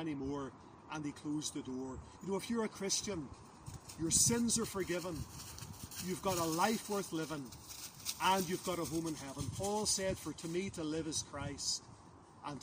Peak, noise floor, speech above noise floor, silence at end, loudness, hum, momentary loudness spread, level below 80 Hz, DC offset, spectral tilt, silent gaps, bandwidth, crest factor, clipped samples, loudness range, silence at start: -16 dBFS; -58 dBFS; 20 dB; 0 s; -37 LUFS; none; 15 LU; -60 dBFS; under 0.1%; -3 dB/octave; none; 16 kHz; 24 dB; under 0.1%; 5 LU; 0 s